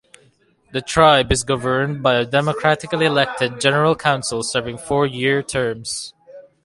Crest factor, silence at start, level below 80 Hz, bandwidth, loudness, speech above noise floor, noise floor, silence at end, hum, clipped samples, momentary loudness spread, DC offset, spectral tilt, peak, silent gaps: 18 dB; 0.75 s; -40 dBFS; 11.5 kHz; -18 LUFS; 39 dB; -57 dBFS; 0.25 s; none; under 0.1%; 10 LU; under 0.1%; -4 dB/octave; 0 dBFS; none